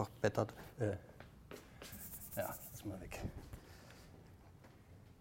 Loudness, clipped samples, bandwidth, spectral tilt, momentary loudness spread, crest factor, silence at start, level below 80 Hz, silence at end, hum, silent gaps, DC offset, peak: -44 LUFS; under 0.1%; 16.5 kHz; -5.5 dB/octave; 22 LU; 26 dB; 0 s; -60 dBFS; 0 s; none; none; under 0.1%; -18 dBFS